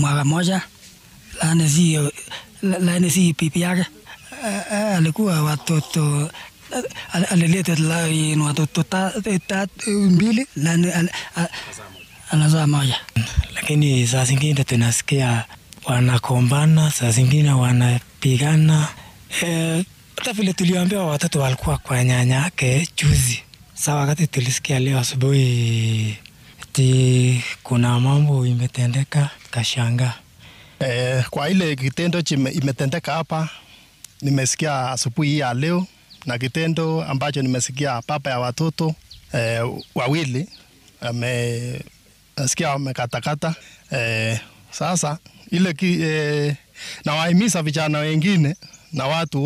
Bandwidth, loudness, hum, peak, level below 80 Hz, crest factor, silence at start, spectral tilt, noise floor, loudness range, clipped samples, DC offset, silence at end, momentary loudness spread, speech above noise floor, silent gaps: 16 kHz; -20 LUFS; none; -4 dBFS; -44 dBFS; 14 dB; 0 s; -5 dB/octave; -46 dBFS; 5 LU; under 0.1%; under 0.1%; 0 s; 11 LU; 27 dB; none